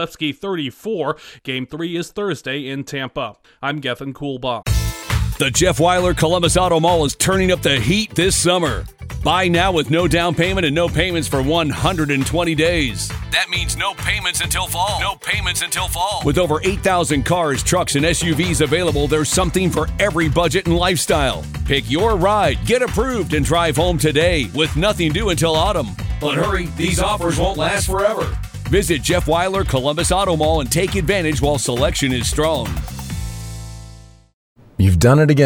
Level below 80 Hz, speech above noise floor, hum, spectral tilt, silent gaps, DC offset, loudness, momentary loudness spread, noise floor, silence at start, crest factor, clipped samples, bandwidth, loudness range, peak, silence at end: -30 dBFS; 23 dB; none; -4.5 dB/octave; 34.33-34.56 s; under 0.1%; -18 LUFS; 10 LU; -40 dBFS; 0 s; 16 dB; under 0.1%; 19.5 kHz; 5 LU; 0 dBFS; 0 s